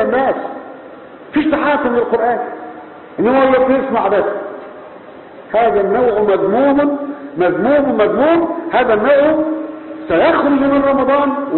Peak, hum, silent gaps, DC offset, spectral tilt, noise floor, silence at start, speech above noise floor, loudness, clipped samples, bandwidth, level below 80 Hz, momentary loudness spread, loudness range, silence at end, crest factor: -2 dBFS; none; none; under 0.1%; -11 dB/octave; -35 dBFS; 0 s; 22 dB; -14 LUFS; under 0.1%; 4.3 kHz; -48 dBFS; 18 LU; 3 LU; 0 s; 12 dB